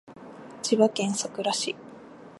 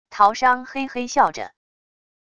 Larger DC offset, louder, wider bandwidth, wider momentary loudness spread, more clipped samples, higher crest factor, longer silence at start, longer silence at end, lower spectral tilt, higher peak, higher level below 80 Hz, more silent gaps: second, under 0.1% vs 0.5%; second, -26 LUFS vs -20 LUFS; first, 11.5 kHz vs 9.6 kHz; first, 23 LU vs 15 LU; neither; about the same, 22 dB vs 20 dB; about the same, 0.05 s vs 0.1 s; second, 0.05 s vs 0.8 s; about the same, -3.5 dB/octave vs -2.5 dB/octave; second, -6 dBFS vs -2 dBFS; second, -74 dBFS vs -60 dBFS; neither